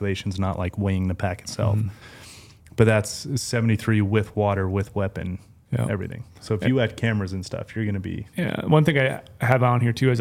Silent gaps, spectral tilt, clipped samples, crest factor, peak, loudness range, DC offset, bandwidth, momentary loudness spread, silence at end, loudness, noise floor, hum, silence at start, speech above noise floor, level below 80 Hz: none; -6.5 dB/octave; under 0.1%; 22 dB; 0 dBFS; 3 LU; under 0.1%; 15.5 kHz; 13 LU; 0 s; -24 LUFS; -46 dBFS; none; 0 s; 24 dB; -50 dBFS